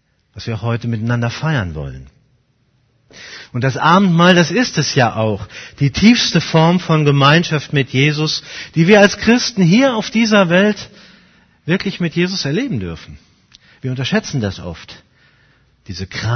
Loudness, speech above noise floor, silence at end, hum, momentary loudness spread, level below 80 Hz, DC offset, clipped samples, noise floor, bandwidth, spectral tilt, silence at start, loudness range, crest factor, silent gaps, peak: -14 LUFS; 45 dB; 0 s; none; 18 LU; -44 dBFS; under 0.1%; under 0.1%; -59 dBFS; 6.6 kHz; -5.5 dB/octave; 0.35 s; 10 LU; 16 dB; none; 0 dBFS